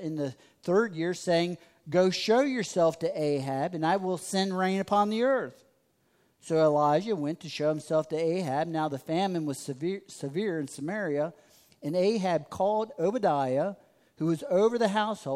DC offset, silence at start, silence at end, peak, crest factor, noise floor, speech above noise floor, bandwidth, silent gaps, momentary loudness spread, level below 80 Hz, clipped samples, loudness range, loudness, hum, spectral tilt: under 0.1%; 0 s; 0 s; -12 dBFS; 16 dB; -69 dBFS; 41 dB; 15.5 kHz; none; 9 LU; -74 dBFS; under 0.1%; 4 LU; -28 LUFS; none; -5.5 dB/octave